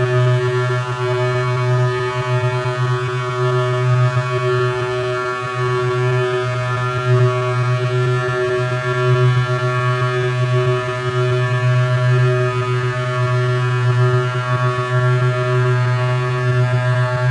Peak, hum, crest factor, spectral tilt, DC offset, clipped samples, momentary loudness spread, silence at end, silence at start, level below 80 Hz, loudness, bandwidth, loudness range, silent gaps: -4 dBFS; none; 12 dB; -7 dB/octave; under 0.1%; under 0.1%; 4 LU; 0 s; 0 s; -50 dBFS; -17 LUFS; 9.8 kHz; 1 LU; none